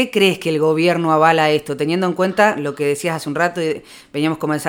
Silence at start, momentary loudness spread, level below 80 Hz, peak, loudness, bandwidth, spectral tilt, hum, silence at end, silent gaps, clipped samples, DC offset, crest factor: 0 s; 8 LU; -60 dBFS; 0 dBFS; -17 LUFS; 17.5 kHz; -5 dB/octave; none; 0 s; none; under 0.1%; under 0.1%; 18 dB